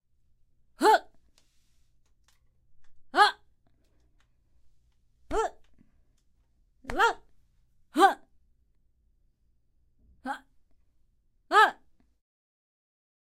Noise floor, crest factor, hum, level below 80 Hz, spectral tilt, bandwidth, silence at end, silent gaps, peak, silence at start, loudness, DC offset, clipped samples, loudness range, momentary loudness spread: -68 dBFS; 24 dB; none; -56 dBFS; -2.5 dB/octave; 16 kHz; 1.5 s; none; -8 dBFS; 0.8 s; -25 LUFS; under 0.1%; under 0.1%; 11 LU; 19 LU